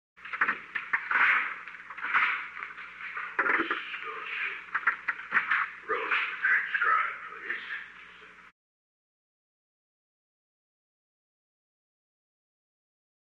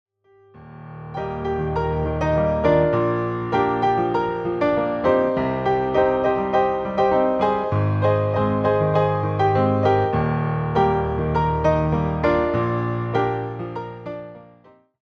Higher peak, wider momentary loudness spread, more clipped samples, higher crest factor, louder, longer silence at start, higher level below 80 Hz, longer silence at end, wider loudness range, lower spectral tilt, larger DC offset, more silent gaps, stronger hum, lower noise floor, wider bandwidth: second, -12 dBFS vs -6 dBFS; first, 15 LU vs 11 LU; neither; first, 20 dB vs 14 dB; second, -29 LUFS vs -21 LUFS; second, 0.2 s vs 0.55 s; second, -78 dBFS vs -40 dBFS; first, 4.85 s vs 0.6 s; first, 9 LU vs 3 LU; second, -3 dB/octave vs -9 dB/octave; neither; neither; first, 60 Hz at -80 dBFS vs none; about the same, -51 dBFS vs -53 dBFS; first, 8.8 kHz vs 6.6 kHz